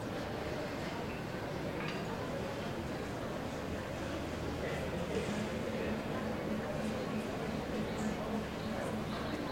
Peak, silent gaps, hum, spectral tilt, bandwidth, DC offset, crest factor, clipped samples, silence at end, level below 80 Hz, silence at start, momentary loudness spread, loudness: -24 dBFS; none; none; -6 dB/octave; 16.5 kHz; under 0.1%; 14 dB; under 0.1%; 0 s; -54 dBFS; 0 s; 3 LU; -39 LUFS